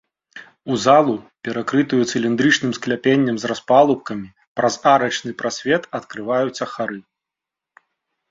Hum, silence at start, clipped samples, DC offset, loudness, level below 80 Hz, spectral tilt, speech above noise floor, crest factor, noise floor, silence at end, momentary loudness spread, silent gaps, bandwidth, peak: none; 0.35 s; under 0.1%; under 0.1%; -19 LUFS; -62 dBFS; -4.5 dB/octave; 67 dB; 18 dB; -86 dBFS; 1.3 s; 13 LU; 4.47-4.55 s; 7.8 kHz; -2 dBFS